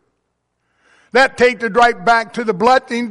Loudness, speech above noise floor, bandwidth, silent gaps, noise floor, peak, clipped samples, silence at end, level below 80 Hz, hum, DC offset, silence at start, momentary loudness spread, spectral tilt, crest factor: -14 LUFS; 56 dB; 11.5 kHz; none; -70 dBFS; -2 dBFS; under 0.1%; 0 s; -50 dBFS; 60 Hz at -60 dBFS; under 0.1%; 1.15 s; 4 LU; -4 dB/octave; 14 dB